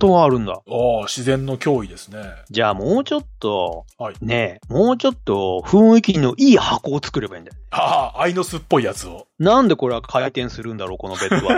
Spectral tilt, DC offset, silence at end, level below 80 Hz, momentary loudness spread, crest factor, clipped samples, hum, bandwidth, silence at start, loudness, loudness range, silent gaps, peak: -6 dB/octave; under 0.1%; 0 s; -42 dBFS; 15 LU; 16 dB; under 0.1%; none; 15.5 kHz; 0 s; -18 LUFS; 6 LU; none; -2 dBFS